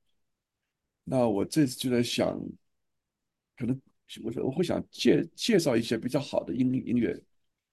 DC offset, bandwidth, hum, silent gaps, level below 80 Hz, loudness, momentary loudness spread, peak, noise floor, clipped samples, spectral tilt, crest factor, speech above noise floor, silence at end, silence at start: under 0.1%; 12.5 kHz; none; none; -60 dBFS; -28 LUFS; 13 LU; -10 dBFS; -86 dBFS; under 0.1%; -5.5 dB/octave; 20 dB; 58 dB; 0.5 s; 1.05 s